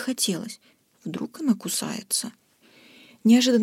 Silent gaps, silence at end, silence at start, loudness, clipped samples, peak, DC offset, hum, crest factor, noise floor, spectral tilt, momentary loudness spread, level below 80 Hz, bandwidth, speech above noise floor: none; 0 s; 0 s; -24 LUFS; under 0.1%; -8 dBFS; under 0.1%; none; 18 dB; -56 dBFS; -3.5 dB/octave; 20 LU; -78 dBFS; 16.5 kHz; 32 dB